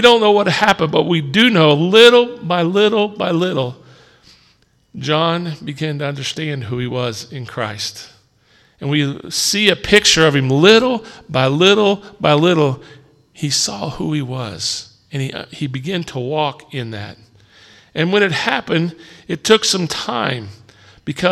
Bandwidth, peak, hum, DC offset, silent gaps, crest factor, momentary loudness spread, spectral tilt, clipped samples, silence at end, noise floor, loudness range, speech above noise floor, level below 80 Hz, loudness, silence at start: 15.5 kHz; 0 dBFS; none; under 0.1%; none; 16 dB; 16 LU; -4 dB/octave; under 0.1%; 0 s; -56 dBFS; 10 LU; 40 dB; -50 dBFS; -15 LUFS; 0 s